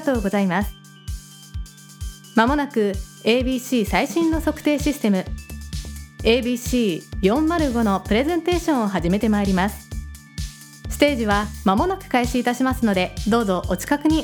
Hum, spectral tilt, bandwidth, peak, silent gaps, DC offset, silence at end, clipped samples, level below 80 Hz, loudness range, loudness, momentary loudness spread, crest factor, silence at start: none; -5.5 dB/octave; over 20 kHz; -2 dBFS; none; under 0.1%; 0 s; under 0.1%; -34 dBFS; 2 LU; -21 LUFS; 16 LU; 20 dB; 0 s